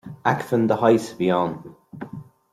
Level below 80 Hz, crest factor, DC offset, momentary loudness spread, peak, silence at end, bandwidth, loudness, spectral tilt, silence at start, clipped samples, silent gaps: -62 dBFS; 18 dB; under 0.1%; 20 LU; -4 dBFS; 0.3 s; 14.5 kHz; -21 LUFS; -7 dB/octave; 0.05 s; under 0.1%; none